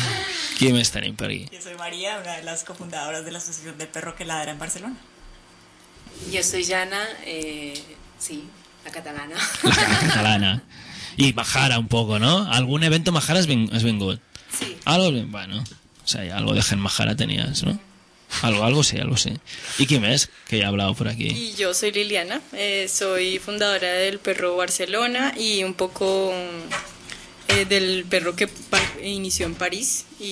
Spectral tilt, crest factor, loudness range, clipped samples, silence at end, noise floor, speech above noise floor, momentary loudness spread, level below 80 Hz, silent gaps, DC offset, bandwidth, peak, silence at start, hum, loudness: -3.5 dB/octave; 20 dB; 9 LU; under 0.1%; 0 s; -50 dBFS; 28 dB; 14 LU; -48 dBFS; none; under 0.1%; 11 kHz; -4 dBFS; 0 s; none; -22 LUFS